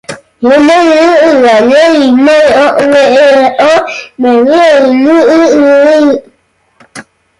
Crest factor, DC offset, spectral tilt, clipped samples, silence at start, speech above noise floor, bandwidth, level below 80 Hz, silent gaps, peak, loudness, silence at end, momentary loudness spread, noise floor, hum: 6 dB; under 0.1%; -4 dB/octave; under 0.1%; 0.1 s; 48 dB; 11.5 kHz; -48 dBFS; none; 0 dBFS; -5 LUFS; 0.4 s; 5 LU; -52 dBFS; none